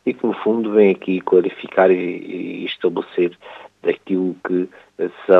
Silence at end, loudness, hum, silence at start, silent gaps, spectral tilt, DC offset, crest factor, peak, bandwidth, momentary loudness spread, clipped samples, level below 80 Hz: 0 s; -19 LUFS; none; 0.05 s; none; -8.5 dB/octave; under 0.1%; 18 dB; 0 dBFS; 4.4 kHz; 12 LU; under 0.1%; -72 dBFS